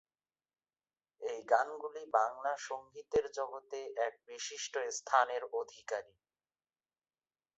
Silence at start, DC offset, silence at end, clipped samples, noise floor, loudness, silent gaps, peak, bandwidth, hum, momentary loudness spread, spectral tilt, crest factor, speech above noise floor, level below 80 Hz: 1.2 s; under 0.1%; 1.55 s; under 0.1%; under -90 dBFS; -37 LUFS; none; -14 dBFS; 8 kHz; none; 12 LU; 0 dB/octave; 24 dB; over 54 dB; -76 dBFS